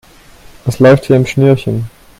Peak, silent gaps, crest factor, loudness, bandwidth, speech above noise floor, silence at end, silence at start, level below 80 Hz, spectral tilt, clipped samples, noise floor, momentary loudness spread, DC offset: 0 dBFS; none; 12 dB; -11 LUFS; 15 kHz; 29 dB; 0.3 s; 0.65 s; -40 dBFS; -7.5 dB/octave; 0.2%; -39 dBFS; 13 LU; under 0.1%